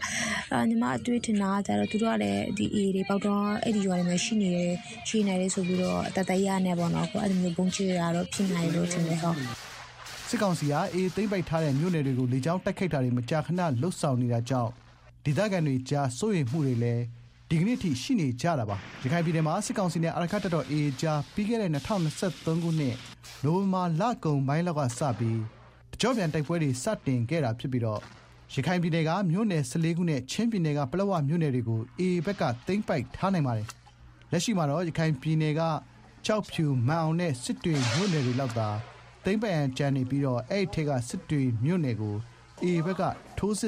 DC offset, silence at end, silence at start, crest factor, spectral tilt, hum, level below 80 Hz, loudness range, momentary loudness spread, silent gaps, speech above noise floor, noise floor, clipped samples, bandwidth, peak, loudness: under 0.1%; 0 s; 0 s; 14 dB; -6 dB/octave; none; -58 dBFS; 2 LU; 5 LU; none; 25 dB; -53 dBFS; under 0.1%; 14.5 kHz; -14 dBFS; -28 LUFS